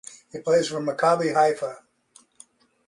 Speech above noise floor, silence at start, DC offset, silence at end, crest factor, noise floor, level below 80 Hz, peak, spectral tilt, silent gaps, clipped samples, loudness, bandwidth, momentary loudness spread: 36 dB; 0.1 s; under 0.1%; 1.1 s; 18 dB; -58 dBFS; -70 dBFS; -8 dBFS; -4.5 dB/octave; none; under 0.1%; -23 LUFS; 11.5 kHz; 13 LU